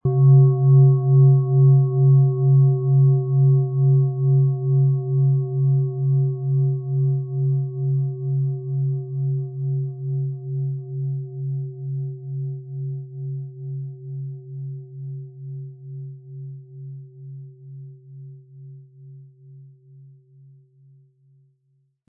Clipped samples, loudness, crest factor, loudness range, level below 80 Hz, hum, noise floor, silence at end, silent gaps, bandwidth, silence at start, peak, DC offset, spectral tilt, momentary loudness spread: under 0.1%; -20 LUFS; 14 dB; 22 LU; -66 dBFS; none; -66 dBFS; 2.45 s; none; 1.2 kHz; 0.05 s; -6 dBFS; under 0.1%; -18 dB/octave; 22 LU